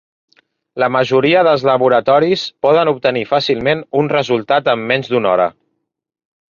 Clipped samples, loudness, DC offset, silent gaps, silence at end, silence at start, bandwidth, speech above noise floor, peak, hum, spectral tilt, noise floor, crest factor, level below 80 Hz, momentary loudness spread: under 0.1%; -14 LUFS; under 0.1%; none; 1 s; 0.75 s; 7.2 kHz; 57 dB; 0 dBFS; none; -6 dB/octave; -71 dBFS; 14 dB; -56 dBFS; 5 LU